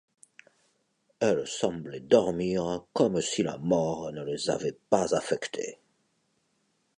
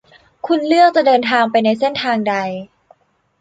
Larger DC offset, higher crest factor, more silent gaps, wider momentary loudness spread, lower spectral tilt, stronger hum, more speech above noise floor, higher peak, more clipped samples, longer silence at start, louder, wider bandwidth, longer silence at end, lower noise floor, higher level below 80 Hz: neither; first, 22 dB vs 14 dB; neither; about the same, 10 LU vs 12 LU; about the same, -5 dB/octave vs -5.5 dB/octave; neither; first, 46 dB vs 39 dB; second, -8 dBFS vs -2 dBFS; neither; first, 1.2 s vs 0.45 s; second, -28 LUFS vs -15 LUFS; first, 11 kHz vs 9.2 kHz; first, 1.25 s vs 0.75 s; first, -73 dBFS vs -53 dBFS; about the same, -62 dBFS vs -64 dBFS